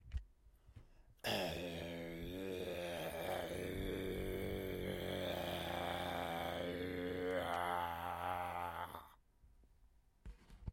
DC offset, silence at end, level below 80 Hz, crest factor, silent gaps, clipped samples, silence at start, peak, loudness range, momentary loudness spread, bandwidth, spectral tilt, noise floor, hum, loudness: under 0.1%; 0 s; -58 dBFS; 18 dB; none; under 0.1%; 0 s; -26 dBFS; 3 LU; 9 LU; 16.5 kHz; -5 dB/octave; -69 dBFS; none; -43 LUFS